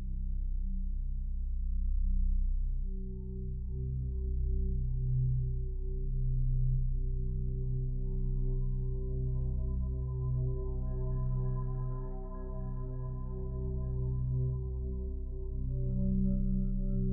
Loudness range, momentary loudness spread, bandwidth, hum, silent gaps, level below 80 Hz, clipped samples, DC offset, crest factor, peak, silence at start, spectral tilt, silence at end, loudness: 3 LU; 7 LU; 1.1 kHz; none; none; -34 dBFS; under 0.1%; under 0.1%; 12 dB; -20 dBFS; 0 s; -14 dB/octave; 0 s; -37 LUFS